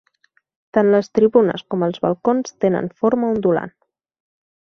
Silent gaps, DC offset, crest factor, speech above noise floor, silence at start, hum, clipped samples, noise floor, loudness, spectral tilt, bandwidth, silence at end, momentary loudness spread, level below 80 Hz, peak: none; under 0.1%; 18 dB; 45 dB; 0.75 s; none; under 0.1%; -62 dBFS; -18 LUFS; -7 dB/octave; 6.6 kHz; 1 s; 7 LU; -58 dBFS; -2 dBFS